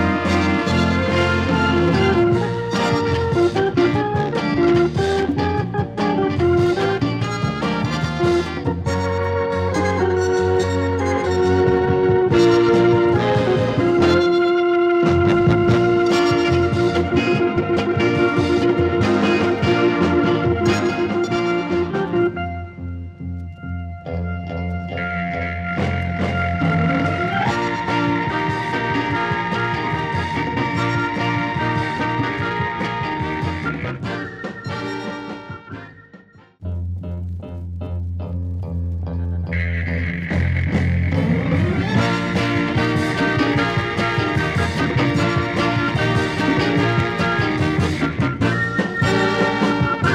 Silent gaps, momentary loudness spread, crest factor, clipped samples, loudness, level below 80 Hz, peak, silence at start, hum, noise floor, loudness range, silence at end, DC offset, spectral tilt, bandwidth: none; 11 LU; 16 dB; under 0.1%; -19 LUFS; -38 dBFS; -4 dBFS; 0 s; none; -46 dBFS; 10 LU; 0 s; under 0.1%; -7 dB/octave; 10 kHz